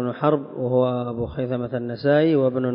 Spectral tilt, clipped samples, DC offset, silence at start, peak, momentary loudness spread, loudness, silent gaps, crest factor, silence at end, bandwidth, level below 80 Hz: -12.5 dB/octave; under 0.1%; under 0.1%; 0 s; -6 dBFS; 9 LU; -22 LUFS; none; 16 dB; 0 s; 5.4 kHz; -50 dBFS